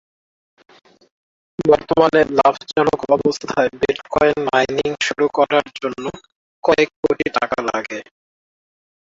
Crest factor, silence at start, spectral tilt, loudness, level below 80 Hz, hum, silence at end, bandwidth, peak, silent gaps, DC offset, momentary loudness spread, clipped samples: 18 dB; 1.6 s; -4.5 dB/octave; -18 LUFS; -52 dBFS; none; 1.15 s; 7.8 kHz; 0 dBFS; 6.32-6.62 s, 6.96-7.03 s; under 0.1%; 11 LU; under 0.1%